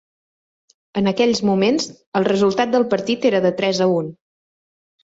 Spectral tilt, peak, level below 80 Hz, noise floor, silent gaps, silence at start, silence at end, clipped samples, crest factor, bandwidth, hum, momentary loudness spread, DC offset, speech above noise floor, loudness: -5.5 dB/octave; -2 dBFS; -58 dBFS; under -90 dBFS; 2.07-2.12 s; 0.95 s; 0.9 s; under 0.1%; 16 dB; 8 kHz; none; 6 LU; under 0.1%; over 72 dB; -18 LUFS